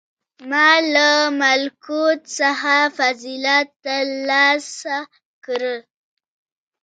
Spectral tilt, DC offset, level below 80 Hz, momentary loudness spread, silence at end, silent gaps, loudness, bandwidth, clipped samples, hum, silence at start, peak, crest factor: 0 dB/octave; under 0.1%; -80 dBFS; 12 LU; 1.05 s; 3.76-3.80 s, 5.25-5.42 s; -17 LUFS; 9.4 kHz; under 0.1%; none; 0.4 s; -2 dBFS; 18 dB